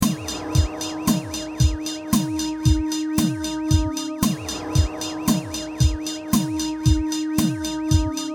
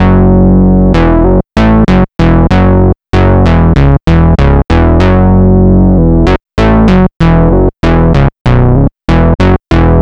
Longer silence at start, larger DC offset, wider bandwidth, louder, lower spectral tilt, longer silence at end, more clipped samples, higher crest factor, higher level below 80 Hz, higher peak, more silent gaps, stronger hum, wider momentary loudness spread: about the same, 0 s vs 0 s; second, under 0.1% vs 3%; first, 19.5 kHz vs 7.4 kHz; second, -23 LUFS vs -7 LUFS; second, -5 dB/octave vs -9 dB/octave; about the same, 0 s vs 0 s; neither; first, 18 dB vs 6 dB; second, -30 dBFS vs -12 dBFS; second, -4 dBFS vs 0 dBFS; second, none vs 7.16-7.20 s, 8.41-8.45 s; neither; about the same, 5 LU vs 3 LU